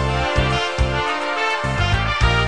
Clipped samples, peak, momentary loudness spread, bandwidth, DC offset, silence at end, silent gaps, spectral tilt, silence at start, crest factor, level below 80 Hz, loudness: under 0.1%; -2 dBFS; 2 LU; 10.5 kHz; 0.9%; 0 s; none; -5 dB/octave; 0 s; 16 dB; -26 dBFS; -19 LUFS